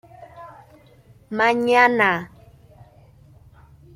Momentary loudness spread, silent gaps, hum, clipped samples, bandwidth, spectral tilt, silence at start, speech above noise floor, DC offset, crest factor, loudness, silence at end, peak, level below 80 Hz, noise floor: 26 LU; none; none; under 0.1%; 14.5 kHz; -5 dB/octave; 0.2 s; 33 dB; under 0.1%; 20 dB; -18 LUFS; 1.7 s; -4 dBFS; -58 dBFS; -51 dBFS